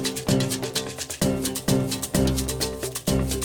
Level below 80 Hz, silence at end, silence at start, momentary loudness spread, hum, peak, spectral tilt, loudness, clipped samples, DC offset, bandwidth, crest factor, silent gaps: -36 dBFS; 0 s; 0 s; 5 LU; none; -8 dBFS; -4.5 dB/octave; -25 LUFS; under 0.1%; under 0.1%; 19 kHz; 16 dB; none